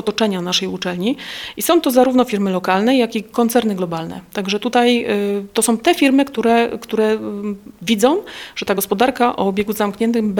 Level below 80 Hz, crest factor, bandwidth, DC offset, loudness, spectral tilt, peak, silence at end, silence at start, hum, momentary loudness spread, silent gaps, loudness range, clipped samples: -54 dBFS; 16 dB; 19.5 kHz; under 0.1%; -17 LUFS; -4.5 dB/octave; 0 dBFS; 0 s; 0 s; none; 11 LU; none; 2 LU; under 0.1%